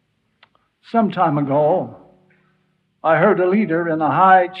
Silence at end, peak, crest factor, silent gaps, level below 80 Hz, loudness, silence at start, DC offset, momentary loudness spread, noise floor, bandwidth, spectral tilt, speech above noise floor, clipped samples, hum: 0 s; -2 dBFS; 16 dB; none; -66 dBFS; -17 LUFS; 0.95 s; under 0.1%; 10 LU; -65 dBFS; 5.2 kHz; -10 dB/octave; 49 dB; under 0.1%; none